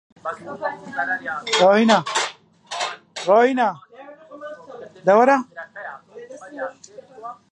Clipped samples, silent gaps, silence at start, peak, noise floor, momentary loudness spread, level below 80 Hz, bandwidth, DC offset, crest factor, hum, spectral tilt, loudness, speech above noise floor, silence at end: under 0.1%; none; 0.25 s; -2 dBFS; -42 dBFS; 23 LU; -74 dBFS; 11 kHz; under 0.1%; 20 dB; none; -3.5 dB/octave; -19 LUFS; 23 dB; 0.2 s